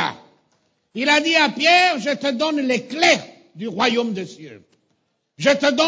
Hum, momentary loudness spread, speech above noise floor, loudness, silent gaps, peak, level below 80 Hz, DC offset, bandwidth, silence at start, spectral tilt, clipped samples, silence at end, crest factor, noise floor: none; 16 LU; 51 dB; -18 LUFS; none; -2 dBFS; -70 dBFS; under 0.1%; 8 kHz; 0 s; -3 dB/octave; under 0.1%; 0 s; 18 dB; -69 dBFS